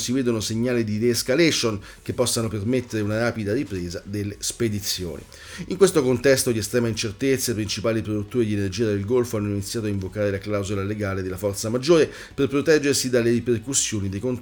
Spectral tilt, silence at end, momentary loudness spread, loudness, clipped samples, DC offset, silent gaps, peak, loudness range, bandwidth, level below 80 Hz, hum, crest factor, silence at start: -4.5 dB/octave; 0 s; 9 LU; -23 LUFS; under 0.1%; under 0.1%; none; -4 dBFS; 4 LU; over 20 kHz; -50 dBFS; none; 20 dB; 0 s